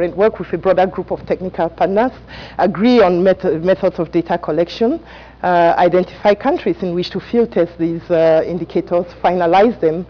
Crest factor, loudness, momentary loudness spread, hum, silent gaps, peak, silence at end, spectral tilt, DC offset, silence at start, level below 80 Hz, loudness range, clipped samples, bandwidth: 10 dB; -16 LUFS; 9 LU; none; none; -4 dBFS; 0.05 s; -8 dB/octave; under 0.1%; 0 s; -44 dBFS; 1 LU; under 0.1%; 5.4 kHz